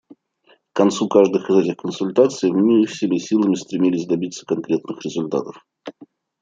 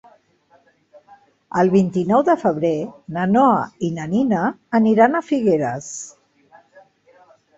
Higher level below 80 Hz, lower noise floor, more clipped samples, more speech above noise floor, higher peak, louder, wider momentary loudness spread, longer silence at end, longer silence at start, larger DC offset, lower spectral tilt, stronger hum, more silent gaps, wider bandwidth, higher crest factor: second, -68 dBFS vs -60 dBFS; about the same, -58 dBFS vs -58 dBFS; neither; about the same, 39 dB vs 40 dB; about the same, -2 dBFS vs -2 dBFS; about the same, -19 LUFS vs -18 LUFS; about the same, 12 LU vs 11 LU; second, 0.35 s vs 1.45 s; second, 0.75 s vs 1.55 s; neither; about the same, -6 dB/octave vs -7 dB/octave; neither; neither; first, 9 kHz vs 8 kHz; about the same, 18 dB vs 18 dB